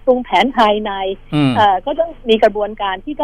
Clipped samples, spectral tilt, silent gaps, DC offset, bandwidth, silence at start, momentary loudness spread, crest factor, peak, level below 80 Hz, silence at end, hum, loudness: under 0.1%; -6.5 dB/octave; none; under 0.1%; 11.5 kHz; 0.05 s; 9 LU; 12 dB; -2 dBFS; -38 dBFS; 0 s; 50 Hz at -45 dBFS; -15 LUFS